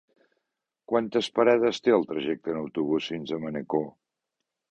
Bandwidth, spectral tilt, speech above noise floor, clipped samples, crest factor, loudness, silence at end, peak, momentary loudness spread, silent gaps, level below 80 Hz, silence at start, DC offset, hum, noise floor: 8.8 kHz; -5.5 dB/octave; 59 dB; under 0.1%; 20 dB; -26 LUFS; 0.8 s; -8 dBFS; 10 LU; none; -68 dBFS; 0.9 s; under 0.1%; none; -85 dBFS